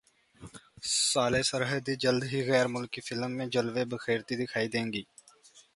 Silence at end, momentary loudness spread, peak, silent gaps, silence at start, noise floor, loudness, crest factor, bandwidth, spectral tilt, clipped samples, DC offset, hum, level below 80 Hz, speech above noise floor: 0.15 s; 11 LU; -10 dBFS; none; 0.4 s; -59 dBFS; -30 LUFS; 22 dB; 11.5 kHz; -3.5 dB/octave; under 0.1%; under 0.1%; none; -64 dBFS; 29 dB